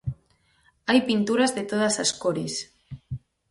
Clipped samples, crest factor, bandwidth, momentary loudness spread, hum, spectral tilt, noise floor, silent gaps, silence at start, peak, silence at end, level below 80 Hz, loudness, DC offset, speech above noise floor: under 0.1%; 20 dB; 11.5 kHz; 18 LU; none; -4 dB/octave; -64 dBFS; none; 0.05 s; -6 dBFS; 0.35 s; -54 dBFS; -24 LUFS; under 0.1%; 41 dB